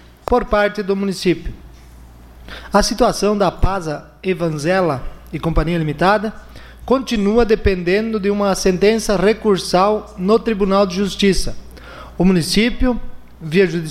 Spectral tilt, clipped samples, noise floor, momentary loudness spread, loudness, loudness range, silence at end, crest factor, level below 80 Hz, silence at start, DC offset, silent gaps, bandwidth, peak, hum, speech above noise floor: -5.5 dB/octave; under 0.1%; -40 dBFS; 12 LU; -17 LUFS; 4 LU; 0 s; 16 dB; -30 dBFS; 0.3 s; under 0.1%; none; 15 kHz; -2 dBFS; none; 24 dB